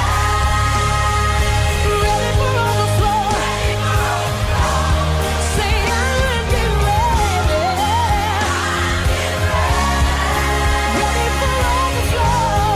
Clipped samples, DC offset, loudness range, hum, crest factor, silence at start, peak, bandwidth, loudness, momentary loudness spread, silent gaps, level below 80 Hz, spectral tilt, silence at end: under 0.1%; under 0.1%; 1 LU; none; 10 dB; 0 s; -6 dBFS; 15.5 kHz; -17 LUFS; 2 LU; none; -20 dBFS; -4.5 dB/octave; 0 s